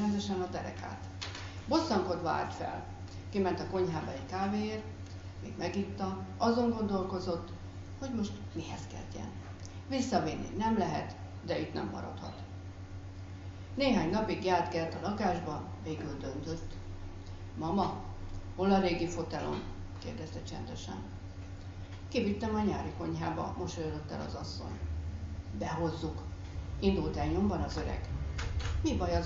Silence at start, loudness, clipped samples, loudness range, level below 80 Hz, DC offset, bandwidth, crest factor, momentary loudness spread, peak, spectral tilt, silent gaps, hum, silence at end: 0 s; -36 LUFS; under 0.1%; 5 LU; -46 dBFS; under 0.1%; 7.6 kHz; 20 dB; 15 LU; -14 dBFS; -5.5 dB/octave; none; none; 0 s